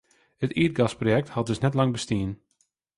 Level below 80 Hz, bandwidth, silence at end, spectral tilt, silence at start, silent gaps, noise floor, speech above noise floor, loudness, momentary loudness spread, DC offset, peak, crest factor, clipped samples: -52 dBFS; 11.5 kHz; 0.6 s; -6.5 dB/octave; 0.4 s; none; -71 dBFS; 47 dB; -26 LUFS; 8 LU; under 0.1%; -8 dBFS; 18 dB; under 0.1%